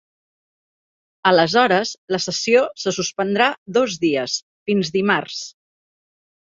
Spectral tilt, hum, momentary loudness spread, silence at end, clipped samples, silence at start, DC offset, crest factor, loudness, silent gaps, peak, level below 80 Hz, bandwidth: -3.5 dB/octave; none; 9 LU; 1 s; under 0.1%; 1.25 s; under 0.1%; 20 dB; -19 LUFS; 1.98-2.08 s, 3.58-3.66 s, 4.42-4.66 s; -2 dBFS; -64 dBFS; 7.8 kHz